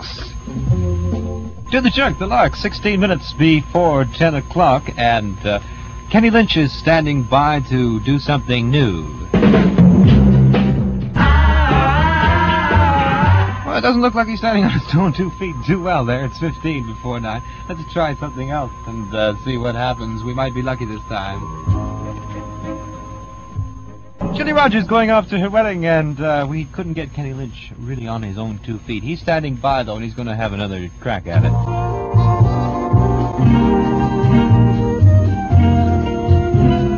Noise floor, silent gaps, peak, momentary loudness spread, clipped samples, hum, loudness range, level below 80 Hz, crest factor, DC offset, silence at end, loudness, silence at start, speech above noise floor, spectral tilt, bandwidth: -36 dBFS; none; 0 dBFS; 14 LU; under 0.1%; none; 10 LU; -26 dBFS; 16 dB; under 0.1%; 0 s; -16 LUFS; 0 s; 19 dB; -7.5 dB/octave; 7 kHz